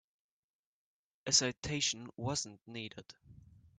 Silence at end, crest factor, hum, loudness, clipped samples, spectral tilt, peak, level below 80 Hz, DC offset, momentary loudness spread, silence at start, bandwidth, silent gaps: 0.35 s; 26 dB; none; -34 LUFS; under 0.1%; -2 dB/octave; -14 dBFS; -66 dBFS; under 0.1%; 17 LU; 1.25 s; 10 kHz; 1.58-1.62 s